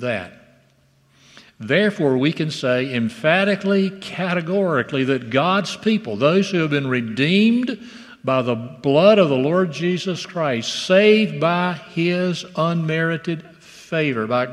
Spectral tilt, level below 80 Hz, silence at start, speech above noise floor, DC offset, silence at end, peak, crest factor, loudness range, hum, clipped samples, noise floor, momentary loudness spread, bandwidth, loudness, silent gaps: -6 dB/octave; -66 dBFS; 0 s; 39 dB; under 0.1%; 0 s; 0 dBFS; 18 dB; 3 LU; none; under 0.1%; -58 dBFS; 10 LU; 11.5 kHz; -19 LUFS; none